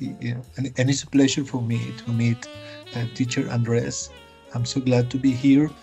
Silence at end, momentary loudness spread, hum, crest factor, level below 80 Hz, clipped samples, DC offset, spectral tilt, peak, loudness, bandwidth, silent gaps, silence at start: 0 s; 12 LU; none; 16 dB; -56 dBFS; under 0.1%; under 0.1%; -5.5 dB/octave; -6 dBFS; -23 LUFS; 8.8 kHz; none; 0 s